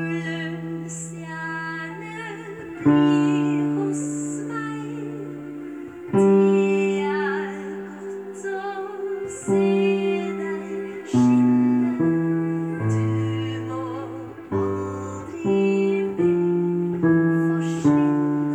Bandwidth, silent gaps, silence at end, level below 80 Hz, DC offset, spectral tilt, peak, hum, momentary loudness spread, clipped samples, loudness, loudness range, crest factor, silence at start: 11 kHz; none; 0 s; -62 dBFS; under 0.1%; -7 dB/octave; -6 dBFS; none; 14 LU; under 0.1%; -23 LUFS; 4 LU; 16 dB; 0 s